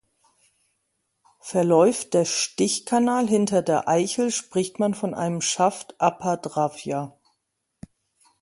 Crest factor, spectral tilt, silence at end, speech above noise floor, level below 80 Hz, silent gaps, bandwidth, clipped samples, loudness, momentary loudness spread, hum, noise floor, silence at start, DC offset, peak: 20 dB; -4.5 dB/octave; 1.35 s; 54 dB; -66 dBFS; none; 11.5 kHz; under 0.1%; -23 LUFS; 8 LU; none; -77 dBFS; 1.45 s; under 0.1%; -4 dBFS